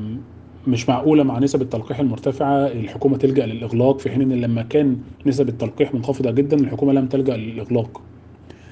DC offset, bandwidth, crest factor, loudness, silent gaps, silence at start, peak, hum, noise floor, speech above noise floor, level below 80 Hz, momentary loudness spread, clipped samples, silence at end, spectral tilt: under 0.1%; 8.2 kHz; 16 dB; -19 LUFS; none; 0 s; -2 dBFS; none; -42 dBFS; 24 dB; -56 dBFS; 6 LU; under 0.1%; 0 s; -8 dB/octave